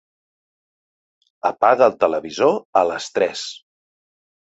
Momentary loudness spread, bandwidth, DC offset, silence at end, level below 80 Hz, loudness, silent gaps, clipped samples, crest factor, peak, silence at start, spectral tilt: 10 LU; 8.2 kHz; under 0.1%; 0.95 s; -64 dBFS; -19 LUFS; 2.65-2.73 s; under 0.1%; 20 dB; -2 dBFS; 1.45 s; -3.5 dB/octave